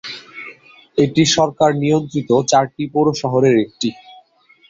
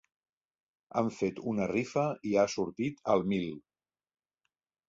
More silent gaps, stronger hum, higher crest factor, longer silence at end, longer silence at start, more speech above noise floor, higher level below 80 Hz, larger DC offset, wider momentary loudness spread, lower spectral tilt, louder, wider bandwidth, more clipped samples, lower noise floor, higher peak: neither; neither; about the same, 16 dB vs 20 dB; second, 0.75 s vs 1.3 s; second, 0.05 s vs 0.95 s; second, 36 dB vs 54 dB; first, -54 dBFS vs -66 dBFS; neither; first, 16 LU vs 6 LU; about the same, -5 dB/octave vs -6 dB/octave; first, -16 LUFS vs -32 LUFS; about the same, 8 kHz vs 7.8 kHz; neither; second, -52 dBFS vs -85 dBFS; first, -2 dBFS vs -14 dBFS